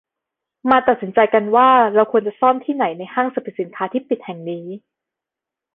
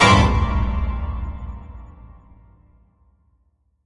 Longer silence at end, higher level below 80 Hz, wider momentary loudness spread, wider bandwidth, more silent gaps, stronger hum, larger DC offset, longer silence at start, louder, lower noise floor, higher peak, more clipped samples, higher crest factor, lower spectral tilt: second, 0.95 s vs 1.95 s; second, -60 dBFS vs -28 dBFS; second, 16 LU vs 26 LU; second, 4.2 kHz vs 11 kHz; neither; neither; neither; first, 0.65 s vs 0 s; first, -17 LUFS vs -20 LUFS; first, -86 dBFS vs -64 dBFS; about the same, 0 dBFS vs -2 dBFS; neither; about the same, 18 dB vs 20 dB; first, -8.5 dB/octave vs -5 dB/octave